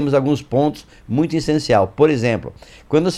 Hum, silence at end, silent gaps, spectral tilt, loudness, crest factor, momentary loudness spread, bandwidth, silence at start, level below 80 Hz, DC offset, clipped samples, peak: none; 0 s; none; -6.5 dB/octave; -18 LUFS; 18 dB; 9 LU; 12 kHz; 0 s; -44 dBFS; under 0.1%; under 0.1%; 0 dBFS